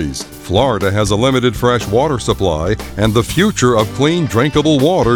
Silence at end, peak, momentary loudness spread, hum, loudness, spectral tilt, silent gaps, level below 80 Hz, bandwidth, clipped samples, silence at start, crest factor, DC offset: 0 s; 0 dBFS; 5 LU; none; -14 LUFS; -5.5 dB/octave; none; -32 dBFS; over 20 kHz; under 0.1%; 0 s; 14 dB; under 0.1%